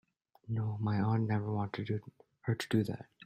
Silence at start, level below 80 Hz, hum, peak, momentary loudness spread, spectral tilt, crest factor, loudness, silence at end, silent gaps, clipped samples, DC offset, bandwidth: 0.45 s; -68 dBFS; none; -16 dBFS; 8 LU; -7.5 dB/octave; 18 dB; -35 LUFS; 0.2 s; none; under 0.1%; under 0.1%; 13 kHz